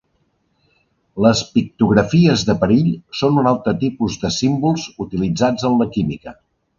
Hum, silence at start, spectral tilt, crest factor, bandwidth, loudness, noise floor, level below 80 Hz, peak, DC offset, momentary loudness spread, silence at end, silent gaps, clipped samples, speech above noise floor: none; 1.15 s; -6 dB/octave; 18 dB; 7.6 kHz; -17 LUFS; -65 dBFS; -44 dBFS; 0 dBFS; under 0.1%; 9 LU; 0.45 s; none; under 0.1%; 48 dB